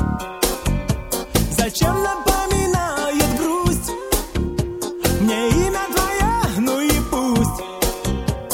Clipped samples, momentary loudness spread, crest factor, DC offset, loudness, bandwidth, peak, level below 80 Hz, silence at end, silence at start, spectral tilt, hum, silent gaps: under 0.1%; 5 LU; 18 dB; under 0.1%; -20 LUFS; 17 kHz; -2 dBFS; -28 dBFS; 0 s; 0 s; -4.5 dB/octave; none; none